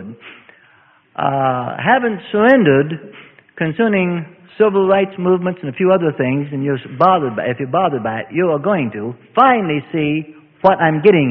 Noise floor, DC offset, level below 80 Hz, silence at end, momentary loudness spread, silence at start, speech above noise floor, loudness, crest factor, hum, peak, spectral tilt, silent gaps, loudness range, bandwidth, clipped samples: -51 dBFS; under 0.1%; -56 dBFS; 0 s; 11 LU; 0 s; 36 dB; -16 LUFS; 16 dB; none; 0 dBFS; -10 dB/octave; none; 2 LU; 5.4 kHz; under 0.1%